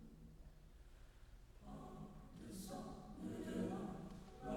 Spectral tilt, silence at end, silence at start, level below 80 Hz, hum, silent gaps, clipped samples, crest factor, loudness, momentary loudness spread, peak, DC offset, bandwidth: -6.5 dB/octave; 0 s; 0 s; -62 dBFS; none; none; under 0.1%; 18 dB; -51 LUFS; 20 LU; -32 dBFS; under 0.1%; 19 kHz